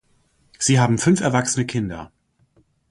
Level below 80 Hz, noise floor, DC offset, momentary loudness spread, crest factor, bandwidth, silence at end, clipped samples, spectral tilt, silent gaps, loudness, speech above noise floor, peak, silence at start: -52 dBFS; -61 dBFS; under 0.1%; 11 LU; 18 dB; 11.5 kHz; 0.85 s; under 0.1%; -5 dB/octave; none; -19 LUFS; 43 dB; -2 dBFS; 0.6 s